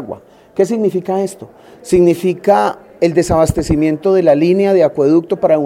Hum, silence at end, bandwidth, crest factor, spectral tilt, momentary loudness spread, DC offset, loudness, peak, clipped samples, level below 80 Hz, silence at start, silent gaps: none; 0 s; 15.5 kHz; 12 dB; -7 dB/octave; 8 LU; under 0.1%; -13 LUFS; 0 dBFS; under 0.1%; -36 dBFS; 0 s; none